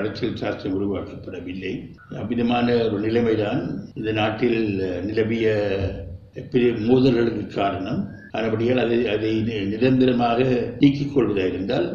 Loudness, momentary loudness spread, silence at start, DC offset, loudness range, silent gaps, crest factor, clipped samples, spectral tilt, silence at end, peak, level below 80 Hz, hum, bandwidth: -22 LUFS; 12 LU; 0 s; under 0.1%; 3 LU; none; 18 dB; under 0.1%; -8 dB/octave; 0 s; -4 dBFS; -48 dBFS; none; 7 kHz